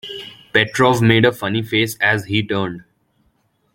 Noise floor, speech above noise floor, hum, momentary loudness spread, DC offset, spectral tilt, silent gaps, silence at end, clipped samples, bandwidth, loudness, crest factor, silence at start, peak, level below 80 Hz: -63 dBFS; 46 dB; none; 15 LU; under 0.1%; -5.5 dB/octave; none; 0.95 s; under 0.1%; 17 kHz; -17 LUFS; 18 dB; 0.05 s; -2 dBFS; -52 dBFS